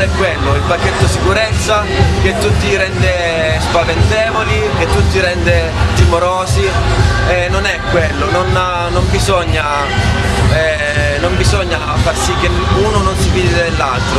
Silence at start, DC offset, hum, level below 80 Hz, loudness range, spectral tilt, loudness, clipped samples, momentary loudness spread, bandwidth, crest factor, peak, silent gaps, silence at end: 0 s; under 0.1%; none; -20 dBFS; 1 LU; -5 dB/octave; -13 LUFS; under 0.1%; 2 LU; 13 kHz; 12 dB; 0 dBFS; none; 0 s